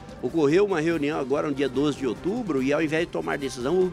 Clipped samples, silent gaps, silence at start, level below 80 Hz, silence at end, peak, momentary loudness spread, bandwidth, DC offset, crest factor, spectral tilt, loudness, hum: under 0.1%; none; 0 s; -52 dBFS; 0 s; -10 dBFS; 7 LU; 14 kHz; under 0.1%; 14 dB; -6 dB/octave; -25 LUFS; none